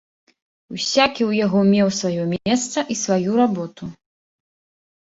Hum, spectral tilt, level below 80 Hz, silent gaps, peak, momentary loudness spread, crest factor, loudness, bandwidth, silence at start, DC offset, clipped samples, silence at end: none; -4.5 dB/octave; -58 dBFS; none; -2 dBFS; 14 LU; 20 dB; -19 LUFS; 8 kHz; 0.7 s; under 0.1%; under 0.1%; 1.1 s